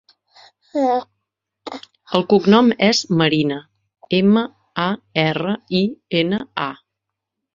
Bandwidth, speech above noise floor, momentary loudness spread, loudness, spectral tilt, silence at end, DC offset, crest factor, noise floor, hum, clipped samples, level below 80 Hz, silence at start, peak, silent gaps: 7.6 kHz; 63 dB; 15 LU; -18 LUFS; -5.5 dB/octave; 0.8 s; under 0.1%; 20 dB; -81 dBFS; none; under 0.1%; -60 dBFS; 0.75 s; 0 dBFS; none